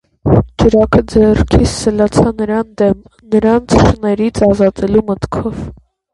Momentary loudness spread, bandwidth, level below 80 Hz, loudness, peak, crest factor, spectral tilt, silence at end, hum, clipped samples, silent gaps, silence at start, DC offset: 9 LU; 11.5 kHz; -26 dBFS; -12 LUFS; 0 dBFS; 12 dB; -7 dB/octave; 0.4 s; none; under 0.1%; none; 0.25 s; under 0.1%